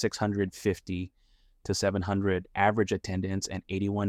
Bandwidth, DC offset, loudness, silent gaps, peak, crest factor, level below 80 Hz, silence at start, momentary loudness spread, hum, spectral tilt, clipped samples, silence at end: 15 kHz; under 0.1%; -30 LUFS; none; -10 dBFS; 20 dB; -56 dBFS; 0 s; 10 LU; none; -5.5 dB/octave; under 0.1%; 0 s